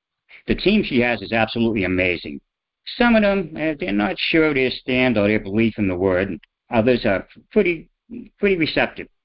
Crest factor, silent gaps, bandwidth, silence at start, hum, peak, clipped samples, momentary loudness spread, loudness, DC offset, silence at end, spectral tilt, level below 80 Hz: 18 dB; none; 5.6 kHz; 0.35 s; none; -2 dBFS; under 0.1%; 14 LU; -20 LUFS; under 0.1%; 0.2 s; -10.5 dB/octave; -42 dBFS